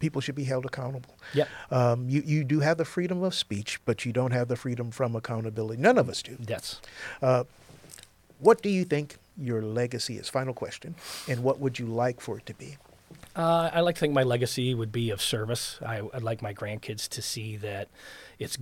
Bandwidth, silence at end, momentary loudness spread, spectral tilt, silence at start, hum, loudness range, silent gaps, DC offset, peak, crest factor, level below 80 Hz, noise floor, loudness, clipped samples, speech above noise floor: 16.5 kHz; 0 s; 14 LU; -5.5 dB/octave; 0 s; none; 4 LU; none; under 0.1%; -6 dBFS; 22 dB; -62 dBFS; -52 dBFS; -29 LUFS; under 0.1%; 24 dB